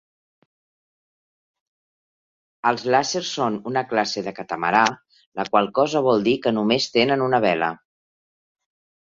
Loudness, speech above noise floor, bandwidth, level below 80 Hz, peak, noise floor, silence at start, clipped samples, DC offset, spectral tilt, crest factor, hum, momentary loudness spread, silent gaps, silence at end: -21 LUFS; over 69 dB; 7.8 kHz; -64 dBFS; -2 dBFS; under -90 dBFS; 2.65 s; under 0.1%; under 0.1%; -4 dB/octave; 22 dB; none; 9 LU; 5.26-5.32 s; 1.4 s